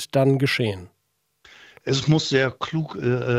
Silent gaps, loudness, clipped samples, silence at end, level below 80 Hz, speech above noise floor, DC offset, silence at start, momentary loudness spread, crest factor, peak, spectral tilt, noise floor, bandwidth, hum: none; -22 LUFS; under 0.1%; 0 s; -58 dBFS; 51 dB; under 0.1%; 0 s; 8 LU; 16 dB; -6 dBFS; -5.5 dB/octave; -72 dBFS; 14.5 kHz; none